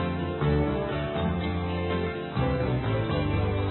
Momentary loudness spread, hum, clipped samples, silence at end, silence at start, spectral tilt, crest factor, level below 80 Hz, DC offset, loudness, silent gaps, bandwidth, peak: 3 LU; none; under 0.1%; 0 s; 0 s; -11.5 dB/octave; 14 dB; -36 dBFS; under 0.1%; -28 LUFS; none; 4.3 kHz; -14 dBFS